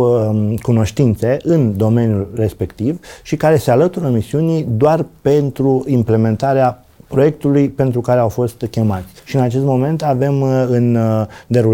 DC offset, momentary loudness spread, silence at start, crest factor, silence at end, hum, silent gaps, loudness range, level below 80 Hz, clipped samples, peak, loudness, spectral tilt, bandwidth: under 0.1%; 6 LU; 0 s; 12 dB; 0 s; none; none; 1 LU; -44 dBFS; under 0.1%; -2 dBFS; -15 LUFS; -8.5 dB/octave; 17 kHz